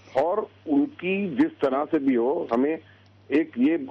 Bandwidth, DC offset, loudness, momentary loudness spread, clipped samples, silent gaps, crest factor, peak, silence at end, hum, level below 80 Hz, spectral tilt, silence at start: 6.2 kHz; under 0.1%; -25 LUFS; 4 LU; under 0.1%; none; 12 dB; -12 dBFS; 0 s; none; -68 dBFS; -8 dB/octave; 0.1 s